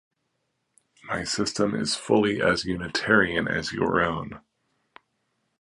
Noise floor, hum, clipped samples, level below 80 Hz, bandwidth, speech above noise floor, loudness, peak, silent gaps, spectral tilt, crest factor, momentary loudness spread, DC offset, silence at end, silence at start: -76 dBFS; none; under 0.1%; -52 dBFS; 11.5 kHz; 52 dB; -24 LUFS; -6 dBFS; none; -4 dB/octave; 22 dB; 9 LU; under 0.1%; 1.25 s; 1.05 s